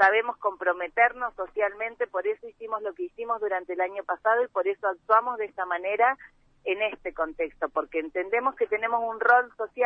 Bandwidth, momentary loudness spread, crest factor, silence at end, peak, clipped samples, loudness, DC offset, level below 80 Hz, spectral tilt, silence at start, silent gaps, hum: 6.2 kHz; 10 LU; 20 dB; 0 s; -8 dBFS; under 0.1%; -27 LUFS; under 0.1%; -64 dBFS; -4.5 dB/octave; 0 s; none; none